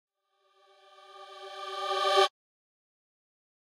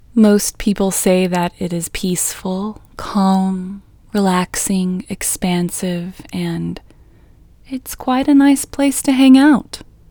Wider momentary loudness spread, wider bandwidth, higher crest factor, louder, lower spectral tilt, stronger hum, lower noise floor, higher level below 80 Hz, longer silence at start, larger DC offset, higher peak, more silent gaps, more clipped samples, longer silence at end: first, 23 LU vs 16 LU; second, 16 kHz vs over 20 kHz; first, 24 dB vs 16 dB; second, -28 LUFS vs -16 LUFS; second, 1.5 dB/octave vs -5 dB/octave; neither; first, -72 dBFS vs -46 dBFS; second, under -90 dBFS vs -42 dBFS; first, 1.1 s vs 0.15 s; neither; second, -12 dBFS vs 0 dBFS; neither; neither; first, 1.4 s vs 0.3 s